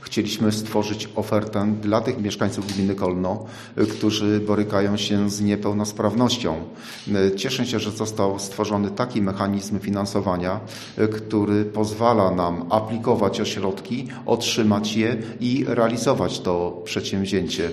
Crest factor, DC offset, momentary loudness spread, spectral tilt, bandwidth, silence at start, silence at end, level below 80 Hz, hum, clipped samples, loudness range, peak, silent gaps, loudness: 20 dB; under 0.1%; 6 LU; -5.5 dB/octave; 13.5 kHz; 0 s; 0 s; -54 dBFS; none; under 0.1%; 2 LU; -2 dBFS; none; -23 LUFS